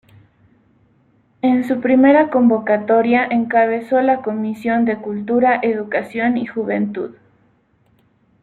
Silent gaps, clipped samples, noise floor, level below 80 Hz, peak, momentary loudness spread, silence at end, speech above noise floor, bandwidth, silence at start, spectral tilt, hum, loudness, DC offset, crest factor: none; under 0.1%; -58 dBFS; -62 dBFS; -2 dBFS; 9 LU; 1.3 s; 42 dB; 4.3 kHz; 1.45 s; -8 dB/octave; none; -17 LUFS; under 0.1%; 16 dB